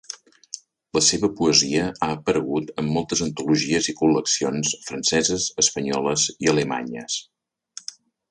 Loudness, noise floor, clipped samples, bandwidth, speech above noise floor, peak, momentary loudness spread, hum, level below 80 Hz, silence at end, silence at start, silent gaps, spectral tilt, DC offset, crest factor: -21 LUFS; -45 dBFS; under 0.1%; 11.5 kHz; 23 dB; -4 dBFS; 19 LU; none; -54 dBFS; 1.1 s; 0.1 s; none; -3 dB/octave; under 0.1%; 20 dB